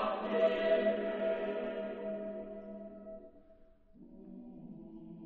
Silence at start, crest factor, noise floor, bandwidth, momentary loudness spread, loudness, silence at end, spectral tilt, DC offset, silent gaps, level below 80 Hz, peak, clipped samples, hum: 0 s; 18 dB; -61 dBFS; 4.7 kHz; 20 LU; -35 LUFS; 0 s; -4 dB/octave; under 0.1%; none; -66 dBFS; -18 dBFS; under 0.1%; none